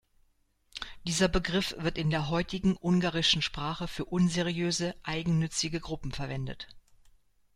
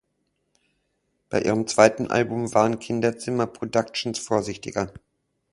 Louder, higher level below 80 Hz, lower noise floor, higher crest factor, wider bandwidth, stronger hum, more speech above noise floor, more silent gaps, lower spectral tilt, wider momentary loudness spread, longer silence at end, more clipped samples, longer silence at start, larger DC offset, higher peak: second, -30 LUFS vs -24 LUFS; first, -48 dBFS vs -56 dBFS; second, -69 dBFS vs -74 dBFS; about the same, 20 dB vs 22 dB; first, 14 kHz vs 11.5 kHz; neither; second, 39 dB vs 51 dB; neither; about the same, -4.5 dB/octave vs -5 dB/octave; about the same, 12 LU vs 11 LU; first, 0.75 s vs 0.55 s; neither; second, 0.75 s vs 1.3 s; neither; second, -10 dBFS vs -2 dBFS